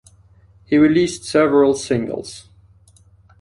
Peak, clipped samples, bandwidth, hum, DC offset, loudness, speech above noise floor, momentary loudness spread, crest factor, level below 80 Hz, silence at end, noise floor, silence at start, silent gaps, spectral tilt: -4 dBFS; under 0.1%; 11.5 kHz; none; under 0.1%; -17 LUFS; 35 dB; 16 LU; 16 dB; -52 dBFS; 1 s; -51 dBFS; 0.7 s; none; -5.5 dB/octave